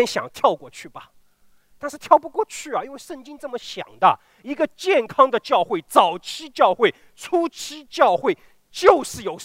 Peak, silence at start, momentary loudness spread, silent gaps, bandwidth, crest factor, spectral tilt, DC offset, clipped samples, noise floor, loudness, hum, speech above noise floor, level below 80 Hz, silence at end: 0 dBFS; 0 s; 18 LU; none; 16 kHz; 22 dB; -3.5 dB/octave; under 0.1%; under 0.1%; -56 dBFS; -20 LUFS; none; 35 dB; -62 dBFS; 0 s